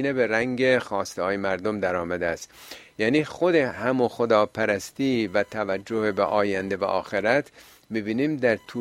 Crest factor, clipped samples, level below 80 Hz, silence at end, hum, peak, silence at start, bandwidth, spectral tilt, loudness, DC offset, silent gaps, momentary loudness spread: 20 dB; under 0.1%; -60 dBFS; 0 s; none; -6 dBFS; 0 s; 16 kHz; -5.5 dB/octave; -24 LUFS; under 0.1%; none; 7 LU